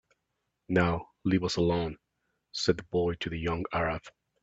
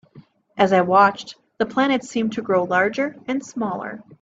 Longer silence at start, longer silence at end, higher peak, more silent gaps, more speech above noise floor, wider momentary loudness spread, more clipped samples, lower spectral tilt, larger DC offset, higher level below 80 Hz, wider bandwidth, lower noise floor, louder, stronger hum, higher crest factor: first, 0.7 s vs 0.15 s; first, 0.35 s vs 0.05 s; second, -8 dBFS vs -2 dBFS; neither; first, 53 dB vs 29 dB; second, 9 LU vs 16 LU; neither; about the same, -6 dB/octave vs -5.5 dB/octave; neither; first, -52 dBFS vs -64 dBFS; about the same, 8 kHz vs 8 kHz; first, -82 dBFS vs -49 dBFS; second, -30 LUFS vs -20 LUFS; neither; about the same, 22 dB vs 18 dB